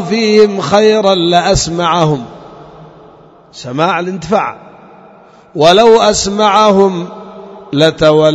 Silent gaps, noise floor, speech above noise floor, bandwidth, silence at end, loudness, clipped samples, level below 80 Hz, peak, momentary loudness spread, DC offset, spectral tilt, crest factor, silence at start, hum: none; -40 dBFS; 30 dB; 9.2 kHz; 0 s; -10 LUFS; 0.5%; -38 dBFS; 0 dBFS; 19 LU; under 0.1%; -4.5 dB/octave; 12 dB; 0 s; none